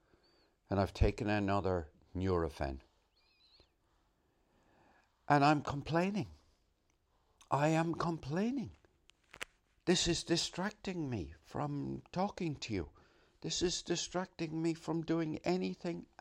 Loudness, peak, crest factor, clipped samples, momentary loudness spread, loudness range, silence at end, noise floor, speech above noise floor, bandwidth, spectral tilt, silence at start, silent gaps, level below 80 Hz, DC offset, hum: -36 LUFS; -14 dBFS; 22 dB; under 0.1%; 11 LU; 4 LU; 0.15 s; -76 dBFS; 41 dB; 15 kHz; -5 dB/octave; 0.7 s; none; -52 dBFS; under 0.1%; none